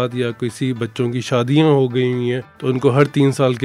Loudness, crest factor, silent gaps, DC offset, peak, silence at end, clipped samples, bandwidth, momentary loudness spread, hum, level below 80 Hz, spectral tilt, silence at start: -18 LUFS; 16 dB; none; under 0.1%; 0 dBFS; 0 s; under 0.1%; 12.5 kHz; 8 LU; none; -60 dBFS; -7 dB/octave; 0 s